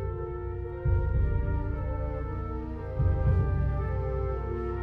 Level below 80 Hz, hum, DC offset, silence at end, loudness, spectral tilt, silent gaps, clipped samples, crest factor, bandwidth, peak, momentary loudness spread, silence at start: -32 dBFS; 60 Hz at -50 dBFS; under 0.1%; 0 s; -31 LUFS; -11 dB/octave; none; under 0.1%; 14 dB; 3.4 kHz; -14 dBFS; 9 LU; 0 s